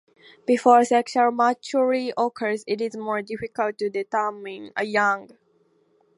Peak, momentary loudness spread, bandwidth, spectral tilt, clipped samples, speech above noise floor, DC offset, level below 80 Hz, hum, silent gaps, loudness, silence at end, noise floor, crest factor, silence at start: -2 dBFS; 12 LU; 11.5 kHz; -4.5 dB/octave; under 0.1%; 41 dB; under 0.1%; -70 dBFS; none; none; -23 LUFS; 0.9 s; -63 dBFS; 20 dB; 0.5 s